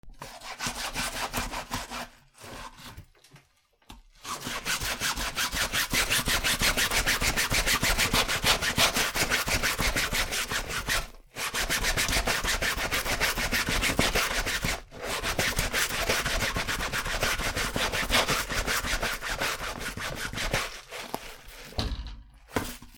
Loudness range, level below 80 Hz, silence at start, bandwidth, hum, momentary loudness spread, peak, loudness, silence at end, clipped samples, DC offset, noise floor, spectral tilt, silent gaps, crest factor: 11 LU; -38 dBFS; 0.05 s; over 20 kHz; none; 14 LU; -8 dBFS; -27 LUFS; 0 s; under 0.1%; under 0.1%; -65 dBFS; -2 dB/octave; none; 22 dB